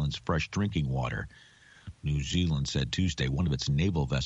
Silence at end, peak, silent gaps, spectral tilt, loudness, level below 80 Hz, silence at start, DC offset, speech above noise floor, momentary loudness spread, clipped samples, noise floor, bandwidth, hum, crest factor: 0 s; -16 dBFS; none; -5.5 dB/octave; -30 LUFS; -42 dBFS; 0 s; under 0.1%; 20 dB; 10 LU; under 0.1%; -49 dBFS; 8.2 kHz; none; 14 dB